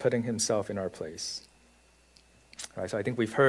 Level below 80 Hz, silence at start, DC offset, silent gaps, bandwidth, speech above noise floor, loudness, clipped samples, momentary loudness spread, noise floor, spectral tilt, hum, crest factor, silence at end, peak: -66 dBFS; 0 s; under 0.1%; none; 12 kHz; 32 dB; -32 LUFS; under 0.1%; 13 LU; -62 dBFS; -4 dB/octave; none; 22 dB; 0 s; -10 dBFS